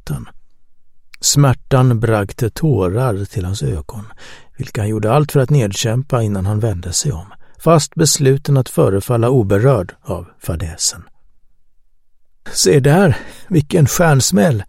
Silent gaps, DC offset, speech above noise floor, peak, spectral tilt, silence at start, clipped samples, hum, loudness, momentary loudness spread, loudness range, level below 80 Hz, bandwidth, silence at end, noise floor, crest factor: none; under 0.1%; 32 dB; 0 dBFS; -5 dB/octave; 0.05 s; under 0.1%; none; -15 LUFS; 14 LU; 4 LU; -38 dBFS; 16.5 kHz; 0.05 s; -47 dBFS; 16 dB